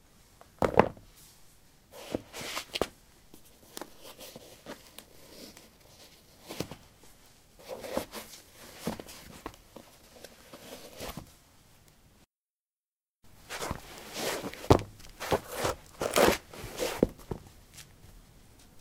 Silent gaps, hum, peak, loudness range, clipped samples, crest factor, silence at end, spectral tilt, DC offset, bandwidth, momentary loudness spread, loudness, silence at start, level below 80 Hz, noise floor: 12.50-12.70 s, 12.80-12.93 s, 13.09-13.14 s; none; 0 dBFS; 19 LU; under 0.1%; 36 dB; 0 s; -4.5 dB/octave; under 0.1%; 17.5 kHz; 27 LU; -33 LUFS; 0.6 s; -54 dBFS; under -90 dBFS